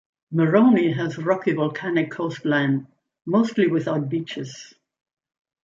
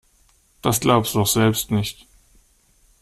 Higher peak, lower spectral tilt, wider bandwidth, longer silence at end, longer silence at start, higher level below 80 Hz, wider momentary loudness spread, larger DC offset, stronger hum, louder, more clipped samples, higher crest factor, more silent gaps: about the same, -4 dBFS vs -2 dBFS; first, -7.5 dB/octave vs -4.5 dB/octave; second, 7.6 kHz vs 16 kHz; second, 0.95 s vs 1.1 s; second, 0.3 s vs 0.65 s; second, -70 dBFS vs -48 dBFS; first, 14 LU vs 8 LU; neither; neither; about the same, -22 LUFS vs -20 LUFS; neither; about the same, 18 dB vs 20 dB; neither